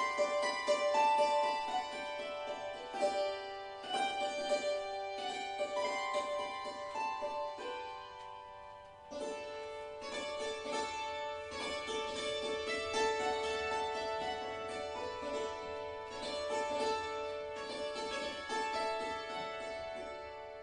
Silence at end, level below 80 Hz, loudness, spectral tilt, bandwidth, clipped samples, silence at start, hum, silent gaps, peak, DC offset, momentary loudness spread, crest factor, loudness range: 0 s; -66 dBFS; -38 LUFS; -2 dB/octave; 11 kHz; under 0.1%; 0 s; none; none; -20 dBFS; under 0.1%; 11 LU; 18 dB; 7 LU